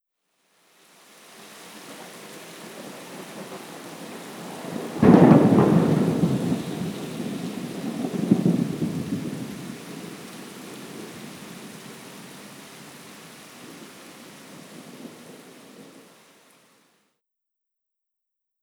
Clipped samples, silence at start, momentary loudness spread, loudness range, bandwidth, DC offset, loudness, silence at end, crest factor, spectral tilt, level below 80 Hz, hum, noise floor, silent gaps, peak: under 0.1%; 1.4 s; 25 LU; 23 LU; 20 kHz; under 0.1%; -22 LUFS; 2.8 s; 26 dB; -7 dB/octave; -60 dBFS; none; -83 dBFS; none; 0 dBFS